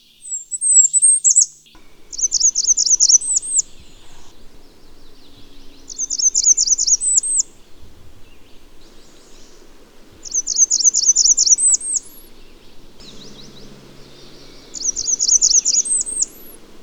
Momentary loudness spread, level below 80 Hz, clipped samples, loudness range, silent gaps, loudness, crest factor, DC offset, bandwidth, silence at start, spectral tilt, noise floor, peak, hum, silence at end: 12 LU; -46 dBFS; under 0.1%; 10 LU; none; -13 LUFS; 18 dB; under 0.1%; over 20 kHz; 0.25 s; 2.5 dB/octave; -42 dBFS; 0 dBFS; none; 0 s